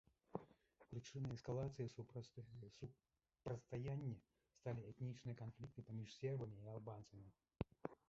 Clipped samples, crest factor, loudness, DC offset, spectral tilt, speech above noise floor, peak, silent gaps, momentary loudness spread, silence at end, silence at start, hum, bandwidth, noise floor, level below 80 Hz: under 0.1%; 24 dB; -52 LUFS; under 0.1%; -7.5 dB/octave; 21 dB; -28 dBFS; none; 11 LU; 0.15 s; 0.35 s; none; 7.6 kHz; -72 dBFS; -72 dBFS